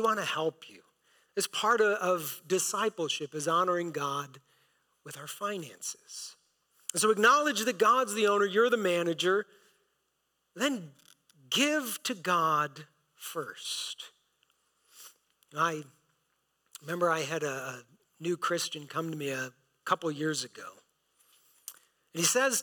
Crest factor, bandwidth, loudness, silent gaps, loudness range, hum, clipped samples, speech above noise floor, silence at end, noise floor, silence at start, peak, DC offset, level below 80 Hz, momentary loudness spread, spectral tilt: 18 dB; 19 kHz; -30 LUFS; none; 10 LU; none; under 0.1%; 48 dB; 0 s; -78 dBFS; 0 s; -14 dBFS; under 0.1%; -84 dBFS; 18 LU; -2.5 dB/octave